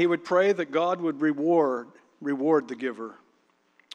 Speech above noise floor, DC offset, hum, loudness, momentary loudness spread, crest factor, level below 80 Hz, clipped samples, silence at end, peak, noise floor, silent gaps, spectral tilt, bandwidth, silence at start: 42 dB; under 0.1%; none; -26 LUFS; 12 LU; 16 dB; -86 dBFS; under 0.1%; 0.8 s; -10 dBFS; -67 dBFS; none; -6.5 dB/octave; 8.6 kHz; 0 s